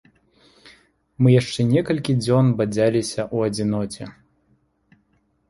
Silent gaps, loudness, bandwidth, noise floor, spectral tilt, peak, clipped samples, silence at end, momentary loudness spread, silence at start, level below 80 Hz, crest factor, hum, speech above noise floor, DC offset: none; -20 LUFS; 11.5 kHz; -65 dBFS; -7 dB/octave; -4 dBFS; under 0.1%; 1.4 s; 9 LU; 0.65 s; -54 dBFS; 18 dB; none; 46 dB; under 0.1%